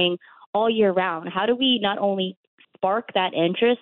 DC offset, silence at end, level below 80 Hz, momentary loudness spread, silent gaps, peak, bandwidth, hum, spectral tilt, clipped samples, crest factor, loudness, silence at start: under 0.1%; 0.05 s; -70 dBFS; 8 LU; 0.46-0.53 s, 2.37-2.58 s; -8 dBFS; 4.2 kHz; none; -9.5 dB/octave; under 0.1%; 14 dB; -22 LUFS; 0 s